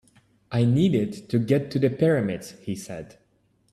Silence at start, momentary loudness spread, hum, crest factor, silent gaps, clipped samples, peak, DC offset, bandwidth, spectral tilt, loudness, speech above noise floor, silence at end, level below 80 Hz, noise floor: 0.5 s; 13 LU; none; 16 dB; none; under 0.1%; -8 dBFS; under 0.1%; 13 kHz; -7.5 dB/octave; -24 LUFS; 42 dB; 0.7 s; -58 dBFS; -66 dBFS